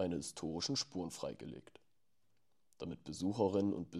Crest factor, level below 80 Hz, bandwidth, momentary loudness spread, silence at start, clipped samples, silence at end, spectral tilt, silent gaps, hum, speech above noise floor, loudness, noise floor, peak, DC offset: 20 dB; -68 dBFS; 14 kHz; 16 LU; 0 s; under 0.1%; 0 s; -5 dB/octave; none; none; 45 dB; -40 LUFS; -84 dBFS; -20 dBFS; under 0.1%